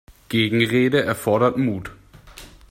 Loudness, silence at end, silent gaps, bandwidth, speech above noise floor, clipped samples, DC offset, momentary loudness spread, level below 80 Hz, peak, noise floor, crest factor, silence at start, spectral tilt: -20 LUFS; 0.25 s; none; 16.5 kHz; 24 dB; under 0.1%; under 0.1%; 8 LU; -50 dBFS; -6 dBFS; -43 dBFS; 16 dB; 0.3 s; -6 dB/octave